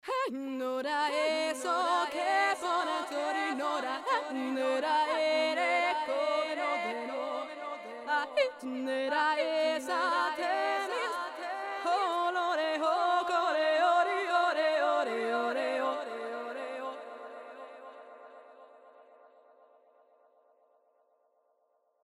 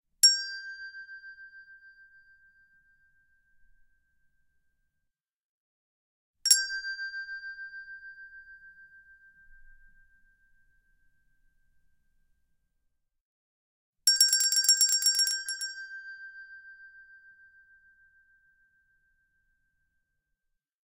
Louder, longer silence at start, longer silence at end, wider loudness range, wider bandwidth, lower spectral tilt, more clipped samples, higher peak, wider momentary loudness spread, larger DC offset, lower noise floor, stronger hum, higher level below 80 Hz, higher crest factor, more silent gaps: second, -31 LUFS vs -24 LUFS; second, 0.05 s vs 0.25 s; second, 3.05 s vs 3.9 s; second, 9 LU vs 22 LU; about the same, 15.5 kHz vs 16 kHz; first, -1.5 dB/octave vs 7.5 dB/octave; neither; second, -16 dBFS vs -4 dBFS; second, 11 LU vs 26 LU; neither; second, -74 dBFS vs -83 dBFS; neither; second, -86 dBFS vs -70 dBFS; second, 16 dB vs 30 dB; second, none vs 5.36-6.34 s, 13.20-13.93 s